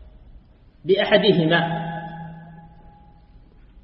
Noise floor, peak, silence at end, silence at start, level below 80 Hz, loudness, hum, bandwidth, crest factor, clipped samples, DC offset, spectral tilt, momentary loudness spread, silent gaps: -49 dBFS; -2 dBFS; 0.05 s; 0 s; -50 dBFS; -20 LUFS; none; 5.8 kHz; 22 dB; under 0.1%; under 0.1%; -10 dB/octave; 21 LU; none